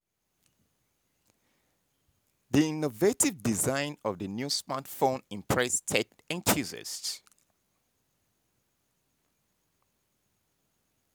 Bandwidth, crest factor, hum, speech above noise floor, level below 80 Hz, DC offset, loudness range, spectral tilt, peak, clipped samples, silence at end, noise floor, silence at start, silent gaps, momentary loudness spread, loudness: over 20 kHz; 26 dB; none; 46 dB; -62 dBFS; under 0.1%; 7 LU; -3.5 dB/octave; -8 dBFS; under 0.1%; 3.95 s; -76 dBFS; 2.5 s; none; 9 LU; -29 LUFS